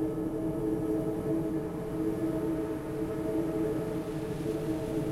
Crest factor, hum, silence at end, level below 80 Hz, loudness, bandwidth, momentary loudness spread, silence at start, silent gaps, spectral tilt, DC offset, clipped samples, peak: 12 dB; none; 0 s; -50 dBFS; -33 LUFS; 16 kHz; 4 LU; 0 s; none; -8 dB/octave; under 0.1%; under 0.1%; -20 dBFS